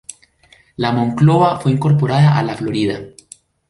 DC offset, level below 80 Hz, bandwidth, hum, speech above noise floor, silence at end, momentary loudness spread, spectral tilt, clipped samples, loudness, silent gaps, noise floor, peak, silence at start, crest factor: under 0.1%; -50 dBFS; 11.5 kHz; none; 37 dB; 0.6 s; 12 LU; -7.5 dB/octave; under 0.1%; -15 LUFS; none; -51 dBFS; -2 dBFS; 0.8 s; 14 dB